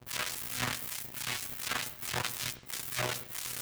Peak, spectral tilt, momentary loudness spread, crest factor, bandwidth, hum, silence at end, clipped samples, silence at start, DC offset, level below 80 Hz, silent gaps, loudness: -16 dBFS; -1.5 dB/octave; 3 LU; 22 dB; over 20 kHz; none; 0 s; under 0.1%; 0 s; under 0.1%; -62 dBFS; none; -35 LUFS